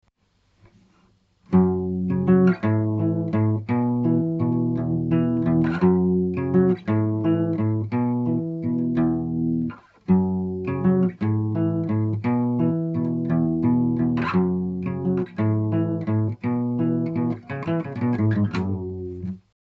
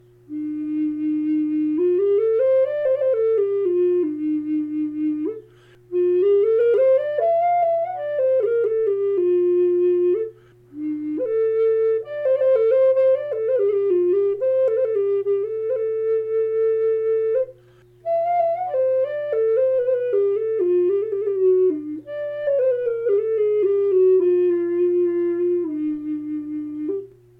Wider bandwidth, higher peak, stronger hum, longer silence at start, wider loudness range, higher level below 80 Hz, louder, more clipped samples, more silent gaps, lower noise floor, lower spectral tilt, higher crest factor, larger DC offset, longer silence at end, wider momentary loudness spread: first, 4.8 kHz vs 3.8 kHz; first, -6 dBFS vs -10 dBFS; neither; first, 1.5 s vs 0.3 s; about the same, 3 LU vs 3 LU; first, -54 dBFS vs -66 dBFS; second, -23 LUFS vs -20 LUFS; neither; neither; first, -66 dBFS vs -51 dBFS; first, -11 dB/octave vs -9 dB/octave; first, 16 dB vs 10 dB; neither; about the same, 0.3 s vs 0.3 s; second, 7 LU vs 10 LU